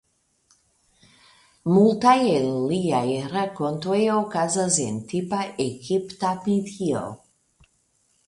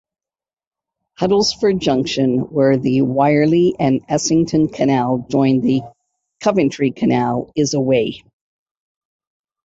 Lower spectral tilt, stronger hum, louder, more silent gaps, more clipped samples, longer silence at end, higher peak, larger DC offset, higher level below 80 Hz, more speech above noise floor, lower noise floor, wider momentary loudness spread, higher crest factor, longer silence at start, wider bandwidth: about the same, -5 dB/octave vs -5.5 dB/octave; neither; second, -23 LUFS vs -17 LUFS; neither; neither; second, 1.1 s vs 1.45 s; second, -6 dBFS vs -2 dBFS; neither; second, -62 dBFS vs -52 dBFS; second, 45 dB vs over 74 dB; second, -67 dBFS vs under -90 dBFS; first, 10 LU vs 5 LU; about the same, 18 dB vs 14 dB; first, 1.65 s vs 1.2 s; first, 11.5 kHz vs 8 kHz